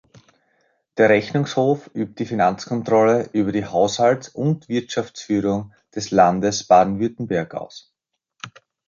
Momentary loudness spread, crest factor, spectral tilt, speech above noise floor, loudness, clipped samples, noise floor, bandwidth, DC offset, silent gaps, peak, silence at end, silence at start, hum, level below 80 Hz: 16 LU; 18 dB; -5.5 dB/octave; 49 dB; -20 LUFS; under 0.1%; -68 dBFS; 7.6 kHz; under 0.1%; none; -2 dBFS; 0.4 s; 0.95 s; none; -56 dBFS